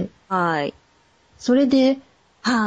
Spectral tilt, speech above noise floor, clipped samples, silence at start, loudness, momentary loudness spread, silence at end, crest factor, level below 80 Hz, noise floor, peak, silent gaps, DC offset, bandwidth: -5.5 dB/octave; 40 dB; under 0.1%; 0 s; -21 LUFS; 12 LU; 0 s; 14 dB; -60 dBFS; -59 dBFS; -8 dBFS; none; under 0.1%; 9 kHz